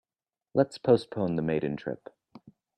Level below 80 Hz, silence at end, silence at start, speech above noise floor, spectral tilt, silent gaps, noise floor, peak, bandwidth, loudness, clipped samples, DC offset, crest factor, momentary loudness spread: -64 dBFS; 0.8 s; 0.55 s; over 63 dB; -8 dB/octave; none; under -90 dBFS; -8 dBFS; 9.8 kHz; -28 LUFS; under 0.1%; under 0.1%; 22 dB; 12 LU